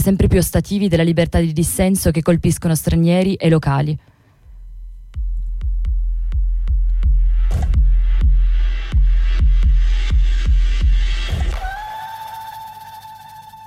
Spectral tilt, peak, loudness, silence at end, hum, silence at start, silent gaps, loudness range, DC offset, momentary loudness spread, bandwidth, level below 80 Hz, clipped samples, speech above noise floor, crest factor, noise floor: -6 dB/octave; -4 dBFS; -18 LUFS; 0 s; none; 0 s; none; 7 LU; under 0.1%; 15 LU; 15 kHz; -18 dBFS; under 0.1%; 27 dB; 12 dB; -42 dBFS